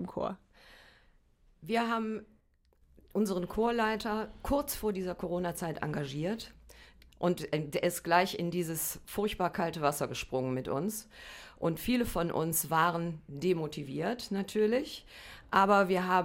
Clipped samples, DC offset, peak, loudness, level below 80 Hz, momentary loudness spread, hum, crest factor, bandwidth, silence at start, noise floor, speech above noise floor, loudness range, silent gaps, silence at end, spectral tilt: under 0.1%; under 0.1%; -12 dBFS; -32 LUFS; -54 dBFS; 11 LU; none; 20 dB; 16.5 kHz; 0 s; -68 dBFS; 36 dB; 4 LU; none; 0 s; -5 dB/octave